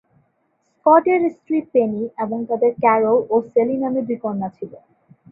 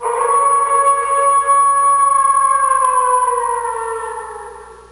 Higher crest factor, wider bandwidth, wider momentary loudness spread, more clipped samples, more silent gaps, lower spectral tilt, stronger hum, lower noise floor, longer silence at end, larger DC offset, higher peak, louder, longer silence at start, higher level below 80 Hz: first, 18 dB vs 10 dB; second, 3.1 kHz vs 11 kHz; second, 11 LU vs 14 LU; neither; neither; first, -10.5 dB/octave vs 0 dB/octave; second, none vs 60 Hz at -50 dBFS; first, -67 dBFS vs -34 dBFS; first, 0.55 s vs 0.1 s; neither; about the same, -2 dBFS vs -4 dBFS; second, -19 LUFS vs -13 LUFS; first, 0.85 s vs 0 s; second, -66 dBFS vs -52 dBFS